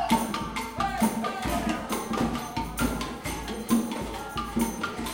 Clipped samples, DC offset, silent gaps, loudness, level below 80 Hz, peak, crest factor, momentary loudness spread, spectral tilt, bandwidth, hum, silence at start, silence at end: under 0.1%; under 0.1%; none; -29 LUFS; -42 dBFS; -10 dBFS; 18 dB; 7 LU; -4.5 dB/octave; 17 kHz; none; 0 s; 0 s